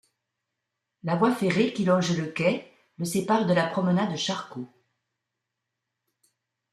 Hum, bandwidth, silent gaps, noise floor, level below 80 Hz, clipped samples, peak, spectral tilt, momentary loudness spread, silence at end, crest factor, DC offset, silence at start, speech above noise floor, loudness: none; 13.5 kHz; none; -84 dBFS; -68 dBFS; under 0.1%; -10 dBFS; -5.5 dB/octave; 12 LU; 2.05 s; 18 dB; under 0.1%; 1.05 s; 59 dB; -25 LUFS